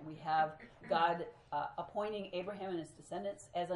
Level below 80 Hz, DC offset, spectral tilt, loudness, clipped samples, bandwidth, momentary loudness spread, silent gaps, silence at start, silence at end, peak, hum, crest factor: -72 dBFS; under 0.1%; -5 dB/octave; -39 LUFS; under 0.1%; 11 kHz; 10 LU; none; 0 s; 0 s; -18 dBFS; none; 20 dB